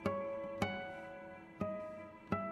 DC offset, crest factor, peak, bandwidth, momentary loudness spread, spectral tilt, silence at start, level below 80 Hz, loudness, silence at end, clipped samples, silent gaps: under 0.1%; 22 dB; -20 dBFS; 14 kHz; 11 LU; -6.5 dB/octave; 0 s; -66 dBFS; -43 LUFS; 0 s; under 0.1%; none